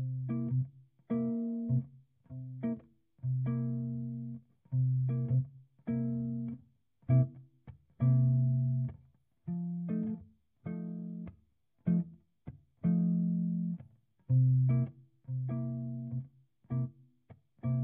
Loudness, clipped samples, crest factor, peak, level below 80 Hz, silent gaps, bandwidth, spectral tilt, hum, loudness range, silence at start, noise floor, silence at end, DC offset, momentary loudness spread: -34 LUFS; under 0.1%; 16 dB; -18 dBFS; -66 dBFS; none; 2.5 kHz; -13 dB/octave; none; 6 LU; 0 s; -72 dBFS; 0 s; under 0.1%; 17 LU